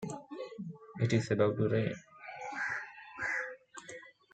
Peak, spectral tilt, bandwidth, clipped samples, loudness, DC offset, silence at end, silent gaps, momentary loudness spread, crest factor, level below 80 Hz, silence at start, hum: -16 dBFS; -6.5 dB/octave; 9.2 kHz; under 0.1%; -35 LUFS; under 0.1%; 0.25 s; none; 18 LU; 20 dB; -72 dBFS; 0 s; none